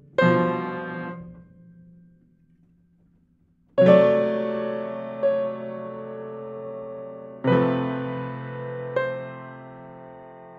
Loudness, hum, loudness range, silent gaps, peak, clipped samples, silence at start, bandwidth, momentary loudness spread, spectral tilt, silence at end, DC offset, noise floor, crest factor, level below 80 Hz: -24 LUFS; none; 7 LU; none; -2 dBFS; under 0.1%; 0.2 s; 7.2 kHz; 21 LU; -9 dB/octave; 0 s; under 0.1%; -62 dBFS; 22 dB; -66 dBFS